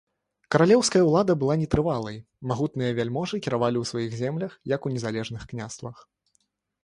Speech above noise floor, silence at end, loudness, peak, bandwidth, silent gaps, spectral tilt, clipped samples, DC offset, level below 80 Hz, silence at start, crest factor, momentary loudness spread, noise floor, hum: 48 dB; 0.9 s; -25 LUFS; -4 dBFS; 11.5 kHz; none; -5.5 dB/octave; under 0.1%; under 0.1%; -52 dBFS; 0.5 s; 20 dB; 16 LU; -72 dBFS; none